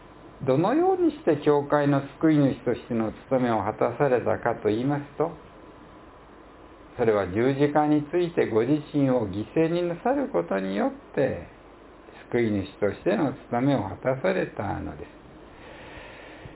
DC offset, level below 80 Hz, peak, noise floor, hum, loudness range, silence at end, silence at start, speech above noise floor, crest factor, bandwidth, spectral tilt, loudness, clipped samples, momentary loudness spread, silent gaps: under 0.1%; -54 dBFS; -8 dBFS; -49 dBFS; none; 5 LU; 0 s; 0 s; 24 dB; 18 dB; 4 kHz; -11.5 dB/octave; -25 LUFS; under 0.1%; 12 LU; none